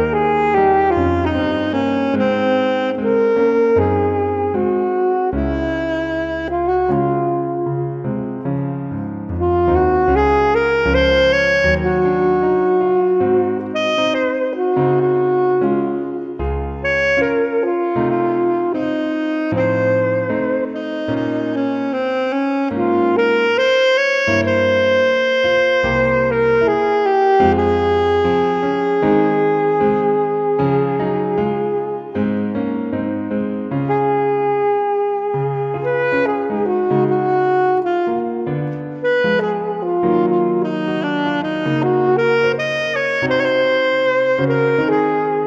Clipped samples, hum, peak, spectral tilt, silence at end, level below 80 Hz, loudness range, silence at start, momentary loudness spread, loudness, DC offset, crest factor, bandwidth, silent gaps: under 0.1%; none; -2 dBFS; -7 dB/octave; 0 s; -36 dBFS; 4 LU; 0 s; 7 LU; -17 LUFS; under 0.1%; 16 dB; 7.4 kHz; none